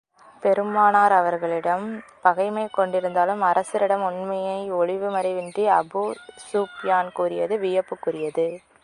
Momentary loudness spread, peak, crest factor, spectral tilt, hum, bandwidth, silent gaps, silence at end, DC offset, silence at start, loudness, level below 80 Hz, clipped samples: 9 LU; -2 dBFS; 20 dB; -5.5 dB/octave; none; 11 kHz; none; 0.25 s; under 0.1%; 0.4 s; -23 LUFS; -72 dBFS; under 0.1%